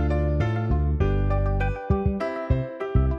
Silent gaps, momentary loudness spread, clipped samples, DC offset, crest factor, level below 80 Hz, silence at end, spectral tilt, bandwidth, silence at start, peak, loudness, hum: none; 3 LU; under 0.1%; under 0.1%; 14 dB; -26 dBFS; 0 s; -9.5 dB/octave; 6.2 kHz; 0 s; -10 dBFS; -25 LUFS; none